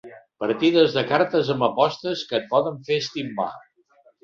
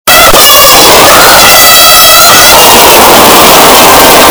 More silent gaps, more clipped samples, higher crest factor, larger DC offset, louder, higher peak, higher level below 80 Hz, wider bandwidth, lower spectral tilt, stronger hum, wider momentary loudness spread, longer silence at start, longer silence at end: neither; second, under 0.1% vs 100%; first, 20 dB vs 0 dB; neither; second, -22 LUFS vs 2 LUFS; second, -4 dBFS vs 0 dBFS; second, -66 dBFS vs -24 dBFS; second, 7.4 kHz vs over 20 kHz; first, -5.5 dB/octave vs -1 dB/octave; neither; first, 10 LU vs 1 LU; about the same, 0.05 s vs 0.05 s; first, 0.65 s vs 0 s